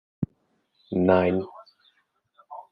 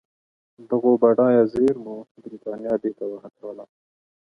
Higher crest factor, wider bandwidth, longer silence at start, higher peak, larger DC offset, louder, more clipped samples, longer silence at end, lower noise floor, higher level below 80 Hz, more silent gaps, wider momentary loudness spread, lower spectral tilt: about the same, 22 dB vs 20 dB; about the same, 5.2 kHz vs 5.4 kHz; second, 0.2 s vs 0.6 s; about the same, -4 dBFS vs -4 dBFS; neither; second, -25 LUFS vs -20 LUFS; neither; second, 0.1 s vs 0.6 s; second, -70 dBFS vs under -90 dBFS; about the same, -66 dBFS vs -62 dBFS; second, none vs 2.11-2.15 s; about the same, 23 LU vs 21 LU; first, -10.5 dB/octave vs -9 dB/octave